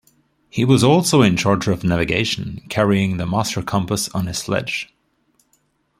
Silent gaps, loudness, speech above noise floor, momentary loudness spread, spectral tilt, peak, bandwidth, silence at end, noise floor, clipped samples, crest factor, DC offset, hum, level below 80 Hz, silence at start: none; -18 LUFS; 46 dB; 12 LU; -5 dB/octave; -2 dBFS; 16 kHz; 1.15 s; -64 dBFS; under 0.1%; 18 dB; under 0.1%; none; -46 dBFS; 0.55 s